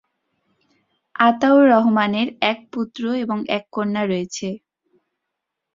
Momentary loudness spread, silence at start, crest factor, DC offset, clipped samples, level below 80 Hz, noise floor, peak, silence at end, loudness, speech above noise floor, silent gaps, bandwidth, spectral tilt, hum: 14 LU; 1.2 s; 20 dB; under 0.1%; under 0.1%; -66 dBFS; -80 dBFS; -2 dBFS; 1.2 s; -19 LUFS; 62 dB; none; 7.6 kHz; -5.5 dB/octave; none